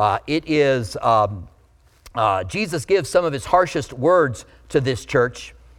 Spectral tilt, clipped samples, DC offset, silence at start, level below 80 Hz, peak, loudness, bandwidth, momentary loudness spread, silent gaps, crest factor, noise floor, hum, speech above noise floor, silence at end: -5.5 dB/octave; under 0.1%; under 0.1%; 0 s; -46 dBFS; -2 dBFS; -20 LUFS; 15 kHz; 6 LU; none; 18 dB; -54 dBFS; none; 35 dB; 0.3 s